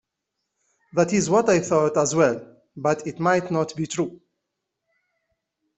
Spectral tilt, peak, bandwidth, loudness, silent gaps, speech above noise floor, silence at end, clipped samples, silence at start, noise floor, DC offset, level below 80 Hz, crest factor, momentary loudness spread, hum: -5 dB/octave; -4 dBFS; 8.4 kHz; -22 LUFS; none; 60 dB; 1.65 s; under 0.1%; 0.95 s; -81 dBFS; under 0.1%; -62 dBFS; 20 dB; 9 LU; none